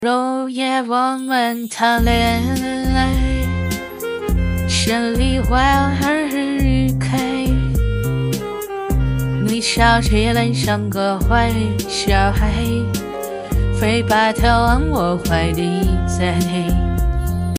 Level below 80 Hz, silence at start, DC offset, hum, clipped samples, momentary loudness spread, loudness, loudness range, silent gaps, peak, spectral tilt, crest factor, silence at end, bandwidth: -24 dBFS; 0 s; under 0.1%; none; under 0.1%; 6 LU; -18 LUFS; 2 LU; none; -2 dBFS; -5.5 dB/octave; 16 dB; 0 s; 16 kHz